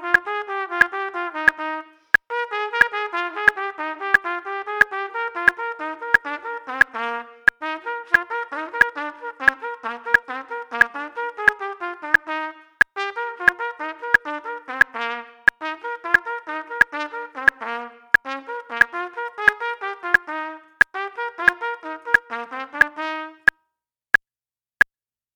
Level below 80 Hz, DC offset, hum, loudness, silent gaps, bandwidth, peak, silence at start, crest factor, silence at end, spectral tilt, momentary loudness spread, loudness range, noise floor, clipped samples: -60 dBFS; under 0.1%; none; -21 LUFS; none; 19.5 kHz; 0 dBFS; 0 s; 22 dB; 2.05 s; -3 dB/octave; 11 LU; 1 LU; under -90 dBFS; under 0.1%